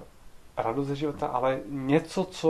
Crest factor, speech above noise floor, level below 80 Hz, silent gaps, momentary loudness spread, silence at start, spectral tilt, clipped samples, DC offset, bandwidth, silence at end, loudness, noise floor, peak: 20 dB; 21 dB; -54 dBFS; none; 6 LU; 0 s; -6.5 dB/octave; under 0.1%; under 0.1%; 13 kHz; 0 s; -29 LUFS; -49 dBFS; -8 dBFS